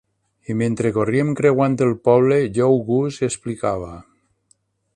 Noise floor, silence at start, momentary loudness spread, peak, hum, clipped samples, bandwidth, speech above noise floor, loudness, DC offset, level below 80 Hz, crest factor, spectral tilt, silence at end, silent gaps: -62 dBFS; 0.5 s; 9 LU; -2 dBFS; none; under 0.1%; 11 kHz; 44 dB; -19 LUFS; under 0.1%; -52 dBFS; 18 dB; -7 dB/octave; 0.95 s; none